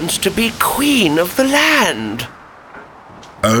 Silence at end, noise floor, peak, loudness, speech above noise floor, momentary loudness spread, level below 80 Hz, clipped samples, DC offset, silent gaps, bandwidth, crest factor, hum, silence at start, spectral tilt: 0 s; -38 dBFS; 0 dBFS; -14 LUFS; 23 dB; 12 LU; -44 dBFS; under 0.1%; under 0.1%; none; over 20 kHz; 16 dB; none; 0 s; -3 dB/octave